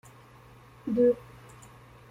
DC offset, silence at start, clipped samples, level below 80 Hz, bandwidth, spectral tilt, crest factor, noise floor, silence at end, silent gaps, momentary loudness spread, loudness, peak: under 0.1%; 0.85 s; under 0.1%; -62 dBFS; 11.5 kHz; -8 dB/octave; 18 dB; -53 dBFS; 0.95 s; none; 26 LU; -27 LUFS; -14 dBFS